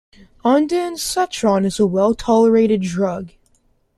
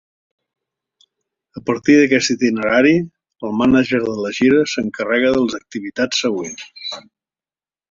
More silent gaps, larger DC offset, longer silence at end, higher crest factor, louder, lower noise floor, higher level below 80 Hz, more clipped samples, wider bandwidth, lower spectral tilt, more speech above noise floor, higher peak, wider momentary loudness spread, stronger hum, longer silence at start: neither; neither; second, 0.7 s vs 0.9 s; about the same, 14 dB vs 18 dB; about the same, -17 LUFS vs -16 LUFS; second, -60 dBFS vs under -90 dBFS; about the same, -48 dBFS vs -52 dBFS; neither; first, 13.5 kHz vs 7.6 kHz; about the same, -5.5 dB/octave vs -4.5 dB/octave; second, 43 dB vs over 74 dB; second, -4 dBFS vs 0 dBFS; second, 9 LU vs 15 LU; neither; second, 0.45 s vs 1.55 s